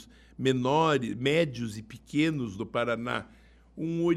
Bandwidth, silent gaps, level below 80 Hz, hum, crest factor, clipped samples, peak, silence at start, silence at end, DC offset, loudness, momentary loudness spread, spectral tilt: 13 kHz; none; -58 dBFS; none; 18 dB; under 0.1%; -12 dBFS; 0 s; 0 s; under 0.1%; -29 LUFS; 12 LU; -6 dB/octave